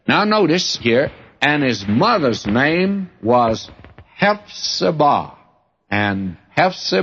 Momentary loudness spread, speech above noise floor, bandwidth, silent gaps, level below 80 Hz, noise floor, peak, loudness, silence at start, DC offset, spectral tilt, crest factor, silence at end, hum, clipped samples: 8 LU; 40 dB; 7.8 kHz; none; -50 dBFS; -57 dBFS; -2 dBFS; -17 LUFS; 0.05 s; under 0.1%; -5 dB/octave; 16 dB; 0 s; none; under 0.1%